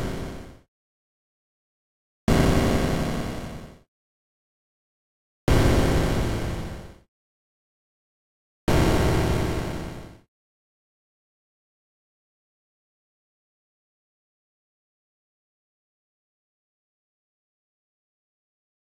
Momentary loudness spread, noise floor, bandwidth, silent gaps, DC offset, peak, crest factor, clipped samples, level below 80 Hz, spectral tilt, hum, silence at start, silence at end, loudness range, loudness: 17 LU; under -90 dBFS; 16.5 kHz; 0.68-2.27 s, 3.88-5.47 s, 7.08-8.67 s; 0.7%; -10 dBFS; 20 dB; under 0.1%; -36 dBFS; -6 dB/octave; none; 0 s; 8.7 s; 2 LU; -24 LUFS